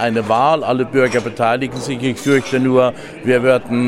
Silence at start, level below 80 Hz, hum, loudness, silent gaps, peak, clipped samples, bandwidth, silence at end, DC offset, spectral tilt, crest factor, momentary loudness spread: 0 s; -52 dBFS; none; -16 LUFS; none; 0 dBFS; under 0.1%; 14 kHz; 0 s; under 0.1%; -6 dB/octave; 16 dB; 6 LU